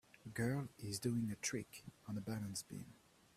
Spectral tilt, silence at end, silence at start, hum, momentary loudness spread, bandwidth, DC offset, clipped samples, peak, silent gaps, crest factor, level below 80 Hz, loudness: -5 dB/octave; 0.4 s; 0.25 s; none; 13 LU; 15.5 kHz; under 0.1%; under 0.1%; -26 dBFS; none; 18 dB; -72 dBFS; -44 LUFS